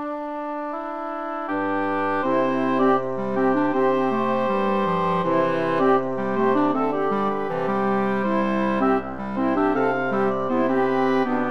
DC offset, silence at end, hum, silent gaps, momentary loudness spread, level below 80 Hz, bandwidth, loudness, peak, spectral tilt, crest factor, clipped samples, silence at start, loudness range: 1%; 0 s; none; none; 8 LU; -56 dBFS; 6.6 kHz; -22 LUFS; -8 dBFS; -8 dB/octave; 14 dB; under 0.1%; 0 s; 1 LU